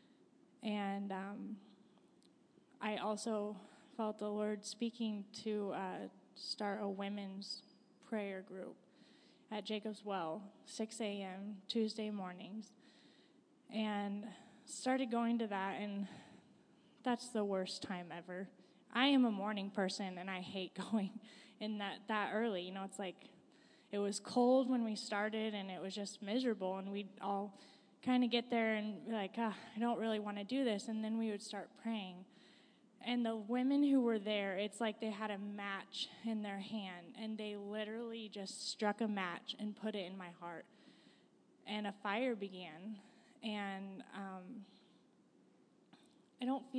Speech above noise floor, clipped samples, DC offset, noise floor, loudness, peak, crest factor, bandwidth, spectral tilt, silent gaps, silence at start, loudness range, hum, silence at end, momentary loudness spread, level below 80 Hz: 30 dB; under 0.1%; under 0.1%; -70 dBFS; -41 LUFS; -18 dBFS; 22 dB; 10.5 kHz; -5 dB/octave; none; 0.65 s; 7 LU; none; 0 s; 14 LU; under -90 dBFS